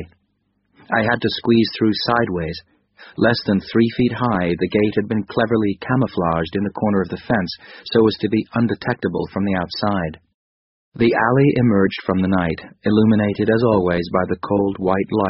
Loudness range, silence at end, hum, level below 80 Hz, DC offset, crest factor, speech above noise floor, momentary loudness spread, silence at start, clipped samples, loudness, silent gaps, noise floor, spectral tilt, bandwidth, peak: 3 LU; 0 s; none; -46 dBFS; under 0.1%; 18 dB; 49 dB; 7 LU; 0 s; under 0.1%; -19 LUFS; 10.34-10.92 s; -68 dBFS; -5.5 dB/octave; 6 kHz; -2 dBFS